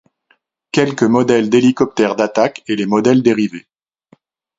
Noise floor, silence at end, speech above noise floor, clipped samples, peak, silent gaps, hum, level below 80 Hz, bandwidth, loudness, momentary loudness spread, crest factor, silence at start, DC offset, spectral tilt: -60 dBFS; 1 s; 46 dB; under 0.1%; 0 dBFS; none; none; -56 dBFS; 7.8 kHz; -14 LUFS; 8 LU; 16 dB; 0.75 s; under 0.1%; -6 dB/octave